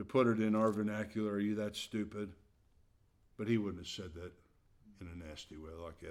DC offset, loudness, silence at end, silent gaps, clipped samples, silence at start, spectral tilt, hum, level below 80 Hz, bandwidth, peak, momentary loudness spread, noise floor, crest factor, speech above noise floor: under 0.1%; -37 LUFS; 0 s; none; under 0.1%; 0 s; -6.5 dB/octave; none; -64 dBFS; 13.5 kHz; -18 dBFS; 18 LU; -70 dBFS; 20 dB; 33 dB